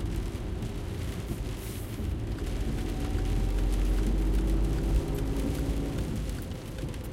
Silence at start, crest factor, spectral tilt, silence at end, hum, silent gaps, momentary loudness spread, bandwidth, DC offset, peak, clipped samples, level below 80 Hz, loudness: 0 s; 14 dB; -6.5 dB/octave; 0 s; none; none; 7 LU; 16 kHz; under 0.1%; -14 dBFS; under 0.1%; -32 dBFS; -32 LUFS